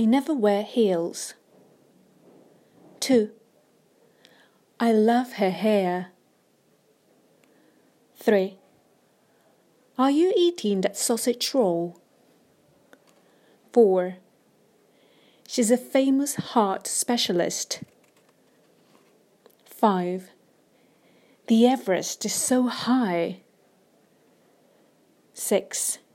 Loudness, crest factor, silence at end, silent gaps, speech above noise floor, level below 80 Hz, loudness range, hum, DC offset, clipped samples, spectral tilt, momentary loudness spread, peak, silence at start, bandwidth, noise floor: -24 LUFS; 20 dB; 0.2 s; none; 41 dB; -80 dBFS; 6 LU; none; under 0.1%; under 0.1%; -4 dB/octave; 12 LU; -6 dBFS; 0 s; 16 kHz; -64 dBFS